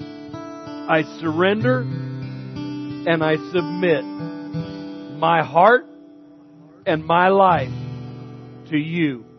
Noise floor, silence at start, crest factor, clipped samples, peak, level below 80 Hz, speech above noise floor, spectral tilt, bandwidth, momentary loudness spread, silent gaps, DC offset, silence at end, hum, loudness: -46 dBFS; 0 s; 20 dB; under 0.1%; -2 dBFS; -58 dBFS; 28 dB; -8 dB/octave; 6.4 kHz; 19 LU; none; under 0.1%; 0.15 s; none; -20 LUFS